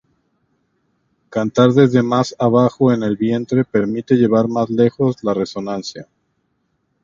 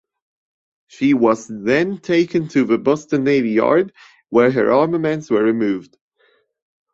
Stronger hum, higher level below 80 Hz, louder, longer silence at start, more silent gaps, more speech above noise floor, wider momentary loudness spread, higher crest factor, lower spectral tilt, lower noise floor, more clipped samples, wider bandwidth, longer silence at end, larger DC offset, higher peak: neither; about the same, -56 dBFS vs -60 dBFS; about the same, -16 LUFS vs -17 LUFS; first, 1.3 s vs 1 s; neither; first, 52 dB vs 44 dB; first, 11 LU vs 5 LU; about the same, 18 dB vs 16 dB; about the same, -7.5 dB/octave vs -6.5 dB/octave; first, -67 dBFS vs -60 dBFS; neither; about the same, 7.4 kHz vs 7.8 kHz; about the same, 1 s vs 1.1 s; neither; about the same, 0 dBFS vs -2 dBFS